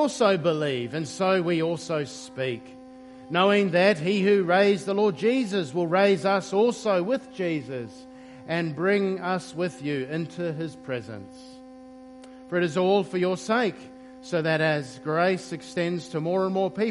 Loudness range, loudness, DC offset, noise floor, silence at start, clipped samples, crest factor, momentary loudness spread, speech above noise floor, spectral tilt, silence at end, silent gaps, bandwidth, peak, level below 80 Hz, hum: 7 LU; -25 LUFS; under 0.1%; -45 dBFS; 0 s; under 0.1%; 18 dB; 17 LU; 21 dB; -5.5 dB/octave; 0 s; none; 11.5 kHz; -6 dBFS; -68 dBFS; none